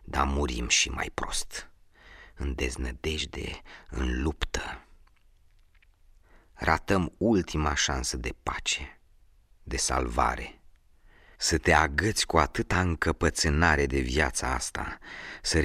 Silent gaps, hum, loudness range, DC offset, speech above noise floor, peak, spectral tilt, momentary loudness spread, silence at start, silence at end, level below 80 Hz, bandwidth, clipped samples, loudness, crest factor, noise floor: none; none; 9 LU; under 0.1%; 32 dB; -6 dBFS; -3.5 dB/octave; 14 LU; 0 s; 0 s; -38 dBFS; 15 kHz; under 0.1%; -28 LUFS; 24 dB; -60 dBFS